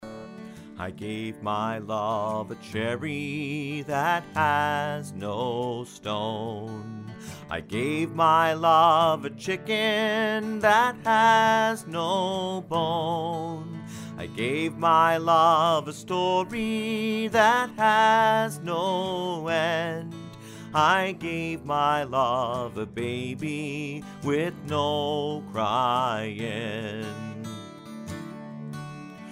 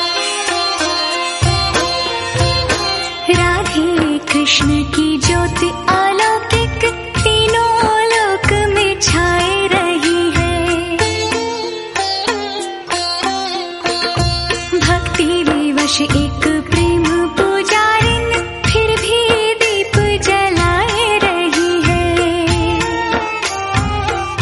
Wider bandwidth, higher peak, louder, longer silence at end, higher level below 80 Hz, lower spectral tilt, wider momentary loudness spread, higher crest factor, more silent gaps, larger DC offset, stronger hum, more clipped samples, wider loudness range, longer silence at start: first, 16 kHz vs 11.5 kHz; second, -6 dBFS vs 0 dBFS; second, -25 LUFS vs -14 LUFS; about the same, 0 s vs 0 s; second, -62 dBFS vs -28 dBFS; about the same, -5 dB/octave vs -4 dB/octave; first, 18 LU vs 5 LU; first, 20 dB vs 14 dB; neither; neither; neither; neither; first, 8 LU vs 3 LU; about the same, 0 s vs 0 s